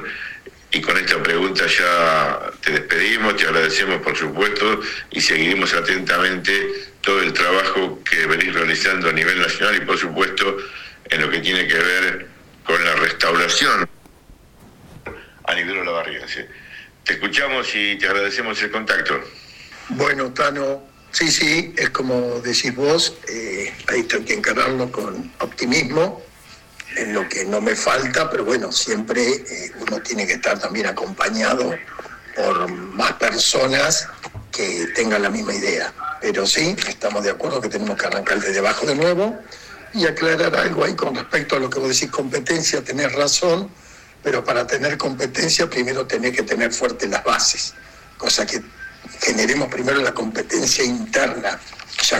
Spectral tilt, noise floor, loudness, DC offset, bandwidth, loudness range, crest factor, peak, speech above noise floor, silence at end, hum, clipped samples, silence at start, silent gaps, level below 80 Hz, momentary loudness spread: -2.5 dB/octave; -47 dBFS; -19 LUFS; under 0.1%; 16.5 kHz; 4 LU; 20 dB; 0 dBFS; 27 dB; 0 s; none; under 0.1%; 0 s; none; -50 dBFS; 12 LU